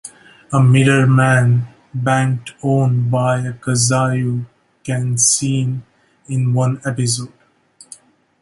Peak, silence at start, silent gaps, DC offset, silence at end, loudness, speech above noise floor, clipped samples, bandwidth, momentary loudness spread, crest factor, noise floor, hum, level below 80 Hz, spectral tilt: 0 dBFS; 0.05 s; none; under 0.1%; 1.15 s; -16 LUFS; 34 dB; under 0.1%; 11.5 kHz; 12 LU; 16 dB; -49 dBFS; none; -52 dBFS; -5 dB/octave